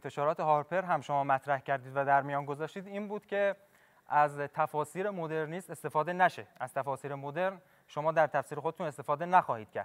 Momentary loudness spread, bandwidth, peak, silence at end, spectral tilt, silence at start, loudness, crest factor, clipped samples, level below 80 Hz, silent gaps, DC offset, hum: 11 LU; 16 kHz; -10 dBFS; 0 s; -6 dB/octave; 0.05 s; -32 LUFS; 22 dB; under 0.1%; -82 dBFS; none; under 0.1%; none